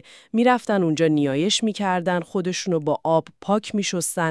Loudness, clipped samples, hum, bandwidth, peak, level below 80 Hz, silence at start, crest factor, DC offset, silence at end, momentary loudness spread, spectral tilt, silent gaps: -22 LUFS; under 0.1%; none; 12 kHz; -6 dBFS; -70 dBFS; 0.35 s; 16 dB; under 0.1%; 0 s; 5 LU; -4.5 dB/octave; none